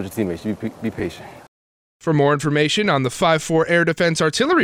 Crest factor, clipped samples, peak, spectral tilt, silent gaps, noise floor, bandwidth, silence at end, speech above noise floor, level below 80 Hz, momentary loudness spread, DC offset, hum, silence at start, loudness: 14 dB; under 0.1%; -6 dBFS; -5 dB/octave; 1.48-2.00 s; under -90 dBFS; 15.5 kHz; 0 s; over 71 dB; -54 dBFS; 11 LU; under 0.1%; none; 0 s; -19 LUFS